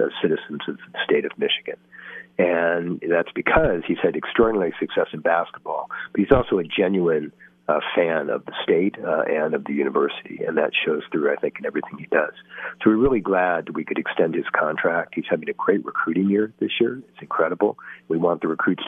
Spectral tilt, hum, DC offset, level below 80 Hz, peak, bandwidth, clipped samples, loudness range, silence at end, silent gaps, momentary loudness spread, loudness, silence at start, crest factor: -8.5 dB/octave; none; under 0.1%; -46 dBFS; 0 dBFS; 3.8 kHz; under 0.1%; 2 LU; 0 s; none; 10 LU; -22 LUFS; 0 s; 22 dB